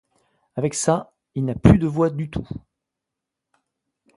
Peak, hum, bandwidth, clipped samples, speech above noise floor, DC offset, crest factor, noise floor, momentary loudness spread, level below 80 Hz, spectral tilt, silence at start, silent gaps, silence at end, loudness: 0 dBFS; none; 11.5 kHz; under 0.1%; 64 dB; under 0.1%; 24 dB; -84 dBFS; 18 LU; -38 dBFS; -6.5 dB/octave; 0.55 s; none; 1.6 s; -21 LUFS